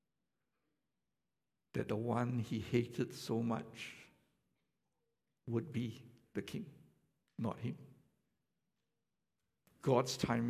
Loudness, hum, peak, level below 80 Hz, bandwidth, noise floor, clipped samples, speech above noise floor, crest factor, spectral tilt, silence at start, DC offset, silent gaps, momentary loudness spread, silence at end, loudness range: -40 LUFS; none; -18 dBFS; -70 dBFS; 15 kHz; under -90 dBFS; under 0.1%; over 52 dB; 24 dB; -6 dB/octave; 1.75 s; under 0.1%; none; 17 LU; 0 s; 8 LU